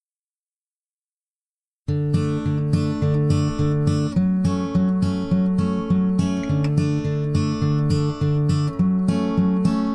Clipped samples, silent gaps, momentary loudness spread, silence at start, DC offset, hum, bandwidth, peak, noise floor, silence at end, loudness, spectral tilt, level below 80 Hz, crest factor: under 0.1%; none; 3 LU; 1.9 s; under 0.1%; none; 10 kHz; -6 dBFS; under -90 dBFS; 0 s; -21 LUFS; -8 dB/octave; -42 dBFS; 16 dB